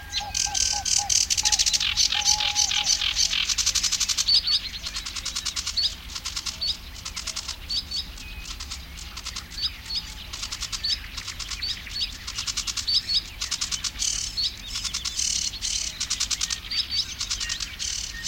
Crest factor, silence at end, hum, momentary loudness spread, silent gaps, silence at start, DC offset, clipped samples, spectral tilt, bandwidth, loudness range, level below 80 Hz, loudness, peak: 20 dB; 0 s; none; 13 LU; none; 0 s; under 0.1%; under 0.1%; 1 dB/octave; 17 kHz; 10 LU; -42 dBFS; -24 LUFS; -6 dBFS